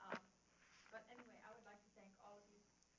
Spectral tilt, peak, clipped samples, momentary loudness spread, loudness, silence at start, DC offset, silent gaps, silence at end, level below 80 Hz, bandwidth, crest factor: -2.5 dB/octave; -32 dBFS; under 0.1%; 13 LU; -62 LUFS; 0 s; under 0.1%; none; 0 s; -90 dBFS; 7.2 kHz; 28 dB